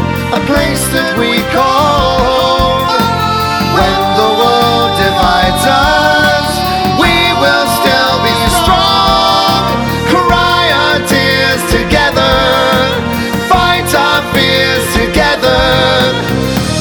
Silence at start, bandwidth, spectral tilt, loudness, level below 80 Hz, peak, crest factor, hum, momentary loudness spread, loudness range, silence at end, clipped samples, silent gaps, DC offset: 0 s; over 20 kHz; -4 dB/octave; -9 LUFS; -26 dBFS; 0 dBFS; 10 dB; none; 4 LU; 1 LU; 0 s; under 0.1%; none; under 0.1%